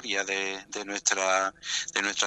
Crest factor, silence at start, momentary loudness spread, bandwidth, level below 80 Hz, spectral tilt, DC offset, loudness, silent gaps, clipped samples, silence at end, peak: 22 dB; 0 s; 8 LU; 11.5 kHz; -68 dBFS; 0.5 dB/octave; under 0.1%; -28 LUFS; none; under 0.1%; 0 s; -8 dBFS